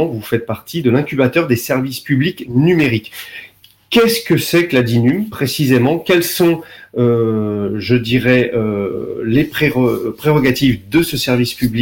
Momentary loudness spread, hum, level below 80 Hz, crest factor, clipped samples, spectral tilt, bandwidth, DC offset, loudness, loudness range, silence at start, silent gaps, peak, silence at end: 8 LU; none; -44 dBFS; 14 dB; under 0.1%; -6 dB/octave; 17 kHz; under 0.1%; -15 LUFS; 2 LU; 0 s; none; -2 dBFS; 0 s